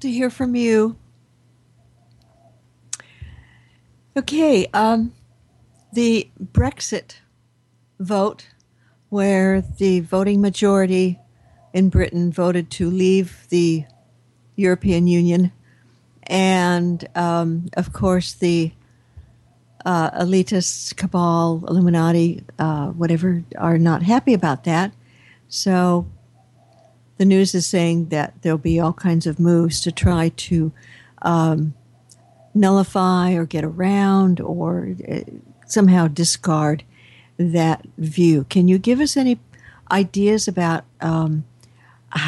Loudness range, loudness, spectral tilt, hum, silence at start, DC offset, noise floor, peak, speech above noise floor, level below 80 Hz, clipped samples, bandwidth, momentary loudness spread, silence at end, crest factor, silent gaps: 4 LU; -19 LUFS; -6 dB/octave; none; 0 s; under 0.1%; -60 dBFS; -4 dBFS; 43 dB; -42 dBFS; under 0.1%; 12 kHz; 10 LU; 0 s; 14 dB; none